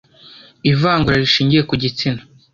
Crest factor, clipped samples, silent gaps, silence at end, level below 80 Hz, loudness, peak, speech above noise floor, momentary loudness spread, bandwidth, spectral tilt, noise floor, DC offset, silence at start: 16 dB; under 0.1%; none; 0.35 s; -42 dBFS; -16 LUFS; -2 dBFS; 28 dB; 8 LU; 7.2 kHz; -6 dB/octave; -44 dBFS; under 0.1%; 0.65 s